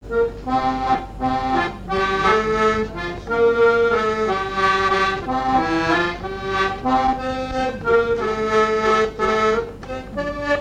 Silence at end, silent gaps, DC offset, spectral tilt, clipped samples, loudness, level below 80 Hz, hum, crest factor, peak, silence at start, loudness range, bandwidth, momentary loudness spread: 0 s; none; 0.2%; -5 dB/octave; under 0.1%; -20 LUFS; -38 dBFS; none; 16 dB; -4 dBFS; 0 s; 2 LU; 9.8 kHz; 7 LU